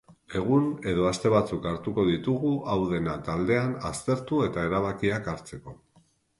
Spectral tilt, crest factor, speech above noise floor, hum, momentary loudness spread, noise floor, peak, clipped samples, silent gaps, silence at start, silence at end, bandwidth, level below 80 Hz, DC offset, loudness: -6.5 dB/octave; 18 dB; 37 dB; none; 8 LU; -64 dBFS; -10 dBFS; under 0.1%; none; 0.1 s; 0.65 s; 11.5 kHz; -50 dBFS; under 0.1%; -27 LUFS